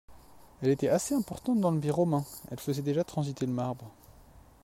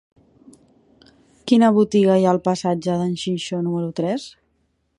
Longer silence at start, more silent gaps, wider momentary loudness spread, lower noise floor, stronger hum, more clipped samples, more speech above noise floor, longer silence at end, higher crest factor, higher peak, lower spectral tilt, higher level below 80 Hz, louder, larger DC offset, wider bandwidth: second, 0.1 s vs 1.45 s; neither; about the same, 10 LU vs 10 LU; second, -55 dBFS vs -67 dBFS; neither; neither; second, 26 dB vs 49 dB; second, 0.25 s vs 0.7 s; about the same, 16 dB vs 18 dB; second, -16 dBFS vs -4 dBFS; about the same, -6.5 dB/octave vs -6.5 dB/octave; about the same, -60 dBFS vs -60 dBFS; second, -30 LUFS vs -19 LUFS; neither; first, 16 kHz vs 11 kHz